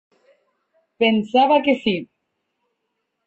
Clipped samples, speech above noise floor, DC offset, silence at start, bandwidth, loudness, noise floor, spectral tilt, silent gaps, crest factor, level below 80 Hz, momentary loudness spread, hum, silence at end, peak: under 0.1%; 58 dB; under 0.1%; 1 s; 7.8 kHz; -18 LUFS; -76 dBFS; -6.5 dB/octave; none; 18 dB; -66 dBFS; 7 LU; none; 1.25 s; -6 dBFS